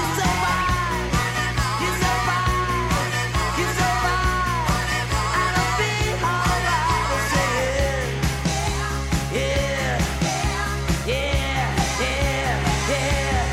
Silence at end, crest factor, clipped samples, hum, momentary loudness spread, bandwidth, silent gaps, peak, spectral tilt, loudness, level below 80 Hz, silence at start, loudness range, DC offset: 0 s; 12 dB; under 0.1%; none; 3 LU; 16.5 kHz; none; -10 dBFS; -4 dB/octave; -22 LUFS; -30 dBFS; 0 s; 2 LU; under 0.1%